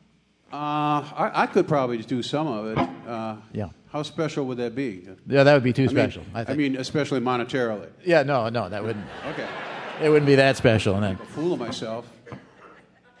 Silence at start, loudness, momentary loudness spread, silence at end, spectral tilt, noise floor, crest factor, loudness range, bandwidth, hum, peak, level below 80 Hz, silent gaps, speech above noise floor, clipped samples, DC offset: 0.5 s; -24 LUFS; 15 LU; 0.5 s; -6.5 dB/octave; -60 dBFS; 20 dB; 4 LU; 11 kHz; none; -4 dBFS; -58 dBFS; none; 37 dB; under 0.1%; under 0.1%